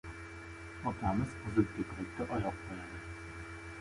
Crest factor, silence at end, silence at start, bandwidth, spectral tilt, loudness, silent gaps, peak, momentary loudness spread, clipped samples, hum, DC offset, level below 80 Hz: 22 dB; 0 s; 0.05 s; 11.5 kHz; -7 dB/octave; -39 LUFS; none; -16 dBFS; 14 LU; under 0.1%; none; under 0.1%; -52 dBFS